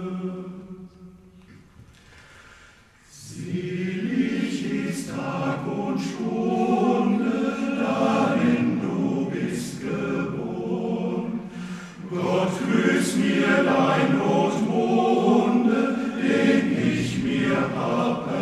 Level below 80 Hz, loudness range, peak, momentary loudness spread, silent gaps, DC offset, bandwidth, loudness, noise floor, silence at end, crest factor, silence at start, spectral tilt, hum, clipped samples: -58 dBFS; 10 LU; -8 dBFS; 12 LU; none; under 0.1%; 13.5 kHz; -23 LUFS; -53 dBFS; 0 s; 16 dB; 0 s; -6 dB/octave; none; under 0.1%